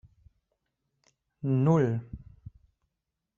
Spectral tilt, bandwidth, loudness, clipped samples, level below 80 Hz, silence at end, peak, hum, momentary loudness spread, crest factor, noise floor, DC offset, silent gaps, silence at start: -10 dB/octave; 7.2 kHz; -27 LUFS; under 0.1%; -58 dBFS; 1.2 s; -12 dBFS; none; 23 LU; 20 dB; -85 dBFS; under 0.1%; none; 1.45 s